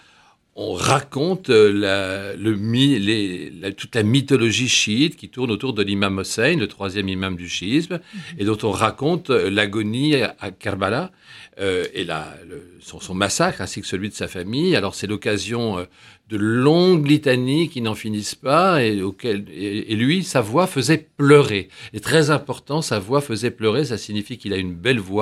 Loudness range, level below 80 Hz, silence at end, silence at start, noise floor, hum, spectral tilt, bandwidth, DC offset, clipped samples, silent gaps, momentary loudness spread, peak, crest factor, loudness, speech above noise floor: 5 LU; -56 dBFS; 0 s; 0.55 s; -55 dBFS; none; -5 dB/octave; 14.5 kHz; under 0.1%; under 0.1%; none; 12 LU; 0 dBFS; 20 dB; -20 LUFS; 35 dB